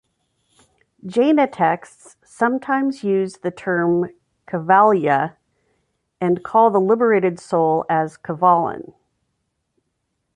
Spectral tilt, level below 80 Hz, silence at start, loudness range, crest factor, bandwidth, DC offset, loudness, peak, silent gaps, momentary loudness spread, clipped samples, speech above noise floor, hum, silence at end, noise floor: -7.5 dB/octave; -66 dBFS; 1.05 s; 3 LU; 18 dB; 11 kHz; under 0.1%; -18 LUFS; -2 dBFS; none; 12 LU; under 0.1%; 56 dB; none; 1.55 s; -73 dBFS